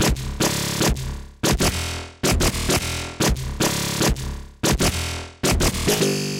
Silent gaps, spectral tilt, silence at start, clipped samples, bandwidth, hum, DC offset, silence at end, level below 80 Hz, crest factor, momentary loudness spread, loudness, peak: none; -3.5 dB/octave; 0 s; under 0.1%; 17 kHz; none; under 0.1%; 0 s; -30 dBFS; 16 dB; 7 LU; -22 LUFS; -6 dBFS